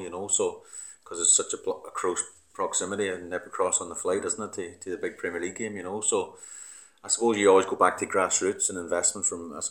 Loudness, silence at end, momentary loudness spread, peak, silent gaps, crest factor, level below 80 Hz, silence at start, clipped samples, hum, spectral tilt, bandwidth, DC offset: -26 LUFS; 0 s; 17 LU; -6 dBFS; none; 22 dB; -70 dBFS; 0 s; under 0.1%; none; -2 dB/octave; 18 kHz; under 0.1%